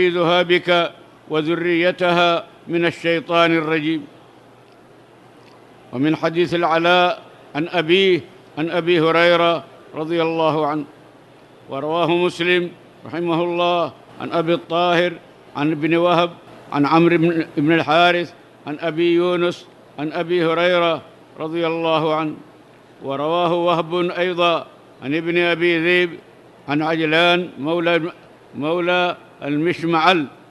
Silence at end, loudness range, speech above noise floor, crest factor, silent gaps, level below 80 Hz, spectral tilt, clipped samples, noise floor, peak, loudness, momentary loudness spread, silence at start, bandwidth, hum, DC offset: 0.15 s; 4 LU; 29 dB; 20 dB; none; -66 dBFS; -6 dB/octave; under 0.1%; -47 dBFS; 0 dBFS; -18 LUFS; 14 LU; 0 s; 11.5 kHz; none; under 0.1%